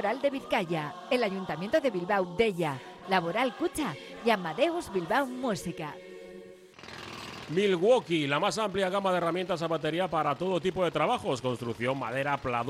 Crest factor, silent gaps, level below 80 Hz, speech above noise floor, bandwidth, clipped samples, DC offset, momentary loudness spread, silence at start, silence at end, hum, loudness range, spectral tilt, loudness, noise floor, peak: 16 dB; none; -62 dBFS; 20 dB; 15.5 kHz; under 0.1%; under 0.1%; 14 LU; 0 s; 0 s; none; 4 LU; -5 dB/octave; -29 LUFS; -49 dBFS; -12 dBFS